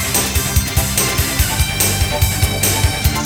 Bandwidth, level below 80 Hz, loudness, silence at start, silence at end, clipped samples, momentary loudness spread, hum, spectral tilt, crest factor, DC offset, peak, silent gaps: over 20 kHz; -24 dBFS; -15 LUFS; 0 s; 0 s; under 0.1%; 1 LU; none; -3 dB/octave; 16 dB; under 0.1%; 0 dBFS; none